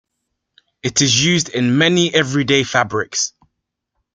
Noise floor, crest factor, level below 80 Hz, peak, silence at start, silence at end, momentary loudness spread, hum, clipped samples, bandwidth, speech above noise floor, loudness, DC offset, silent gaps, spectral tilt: -76 dBFS; 18 dB; -54 dBFS; 0 dBFS; 0.85 s; 0.85 s; 7 LU; none; under 0.1%; 10 kHz; 60 dB; -16 LUFS; under 0.1%; none; -3.5 dB/octave